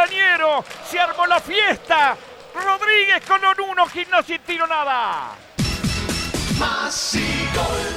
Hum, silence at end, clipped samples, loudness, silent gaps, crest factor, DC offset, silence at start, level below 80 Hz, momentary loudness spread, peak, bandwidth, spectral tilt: none; 0 s; under 0.1%; -19 LUFS; none; 16 dB; under 0.1%; 0 s; -38 dBFS; 9 LU; -4 dBFS; 16.5 kHz; -3 dB/octave